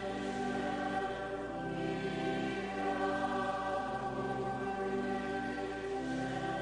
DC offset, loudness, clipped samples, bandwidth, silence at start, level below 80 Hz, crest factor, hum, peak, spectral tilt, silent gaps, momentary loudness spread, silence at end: under 0.1%; -37 LUFS; under 0.1%; 10 kHz; 0 s; -58 dBFS; 14 dB; none; -22 dBFS; -6 dB/octave; none; 4 LU; 0 s